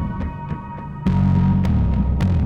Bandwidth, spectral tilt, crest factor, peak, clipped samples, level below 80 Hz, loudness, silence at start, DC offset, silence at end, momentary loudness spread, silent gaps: 6.8 kHz; -9.5 dB/octave; 12 dB; -8 dBFS; under 0.1%; -26 dBFS; -20 LUFS; 0 s; under 0.1%; 0 s; 13 LU; none